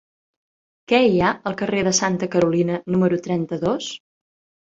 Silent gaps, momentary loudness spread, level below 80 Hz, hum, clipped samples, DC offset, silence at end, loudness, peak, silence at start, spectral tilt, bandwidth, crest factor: none; 8 LU; -54 dBFS; none; under 0.1%; under 0.1%; 0.8 s; -20 LUFS; -4 dBFS; 0.9 s; -4.5 dB/octave; 8 kHz; 18 dB